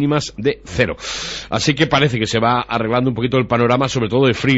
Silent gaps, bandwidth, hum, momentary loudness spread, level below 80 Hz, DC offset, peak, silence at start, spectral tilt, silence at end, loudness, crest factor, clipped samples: none; 8 kHz; none; 7 LU; -42 dBFS; under 0.1%; -2 dBFS; 0 s; -5 dB/octave; 0 s; -17 LUFS; 14 dB; under 0.1%